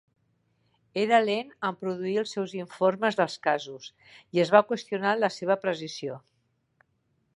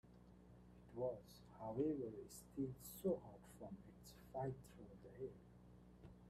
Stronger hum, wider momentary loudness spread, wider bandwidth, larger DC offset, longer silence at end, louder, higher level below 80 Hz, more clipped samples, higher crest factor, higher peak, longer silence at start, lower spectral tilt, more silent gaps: second, none vs 60 Hz at -70 dBFS; second, 14 LU vs 21 LU; second, 11.5 kHz vs 15.5 kHz; neither; first, 1.2 s vs 0 s; first, -27 LUFS vs -49 LUFS; second, -80 dBFS vs -70 dBFS; neither; about the same, 24 dB vs 20 dB; first, -4 dBFS vs -30 dBFS; first, 0.95 s vs 0.05 s; second, -5 dB/octave vs -7 dB/octave; neither